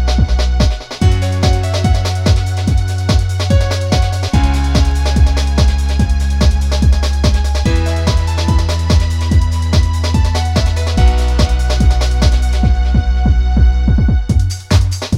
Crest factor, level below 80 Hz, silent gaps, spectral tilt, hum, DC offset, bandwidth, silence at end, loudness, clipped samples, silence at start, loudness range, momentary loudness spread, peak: 12 dB; -14 dBFS; none; -6 dB/octave; none; under 0.1%; 12 kHz; 0 s; -14 LUFS; under 0.1%; 0 s; 1 LU; 2 LU; 0 dBFS